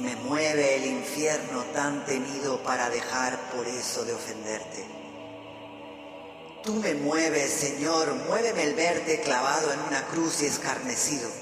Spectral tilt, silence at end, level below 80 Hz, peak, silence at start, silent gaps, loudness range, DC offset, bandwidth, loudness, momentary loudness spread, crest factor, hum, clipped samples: -2.5 dB/octave; 0 s; -68 dBFS; -10 dBFS; 0 s; none; 8 LU; under 0.1%; 15.5 kHz; -27 LUFS; 17 LU; 18 dB; none; under 0.1%